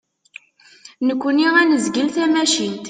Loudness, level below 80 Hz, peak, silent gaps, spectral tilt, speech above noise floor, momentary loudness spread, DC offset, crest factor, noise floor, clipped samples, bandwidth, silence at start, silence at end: -17 LUFS; -66 dBFS; -4 dBFS; none; -2.5 dB/octave; 30 dB; 7 LU; under 0.1%; 16 dB; -47 dBFS; under 0.1%; 9.6 kHz; 0.85 s; 0 s